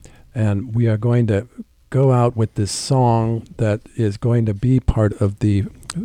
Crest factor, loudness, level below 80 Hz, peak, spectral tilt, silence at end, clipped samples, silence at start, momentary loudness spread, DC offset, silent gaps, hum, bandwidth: 16 dB; -19 LUFS; -36 dBFS; -2 dBFS; -7 dB/octave; 0 s; under 0.1%; 0.35 s; 7 LU; under 0.1%; none; none; 11 kHz